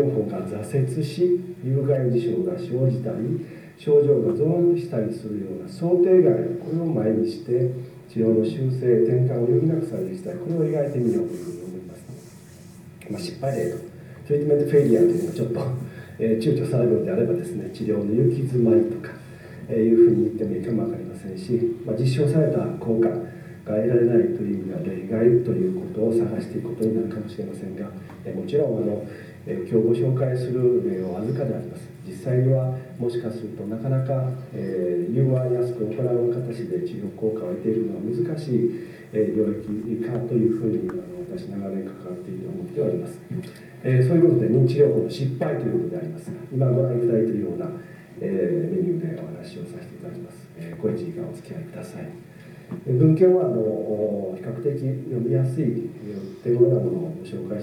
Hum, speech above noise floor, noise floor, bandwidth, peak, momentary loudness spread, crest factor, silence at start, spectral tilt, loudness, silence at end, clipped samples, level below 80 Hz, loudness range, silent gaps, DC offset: none; 22 dB; -44 dBFS; 12 kHz; -6 dBFS; 16 LU; 18 dB; 0 s; -9 dB/octave; -23 LUFS; 0 s; under 0.1%; -64 dBFS; 6 LU; none; under 0.1%